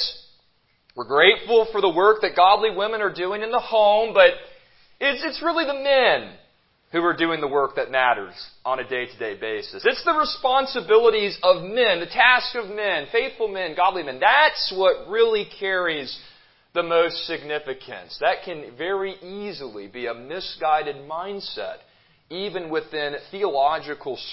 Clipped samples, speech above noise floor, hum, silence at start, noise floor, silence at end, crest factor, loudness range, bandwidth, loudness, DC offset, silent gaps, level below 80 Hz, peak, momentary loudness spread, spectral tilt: under 0.1%; 42 dB; none; 0 s; -64 dBFS; 0 s; 20 dB; 9 LU; 5.8 kHz; -21 LUFS; under 0.1%; none; -60 dBFS; -2 dBFS; 15 LU; -7 dB/octave